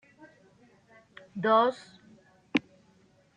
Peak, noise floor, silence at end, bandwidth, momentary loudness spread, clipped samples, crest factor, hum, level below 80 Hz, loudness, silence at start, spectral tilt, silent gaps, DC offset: -8 dBFS; -63 dBFS; 0.75 s; 9.8 kHz; 19 LU; under 0.1%; 24 dB; none; -78 dBFS; -27 LUFS; 1.35 s; -6 dB/octave; none; under 0.1%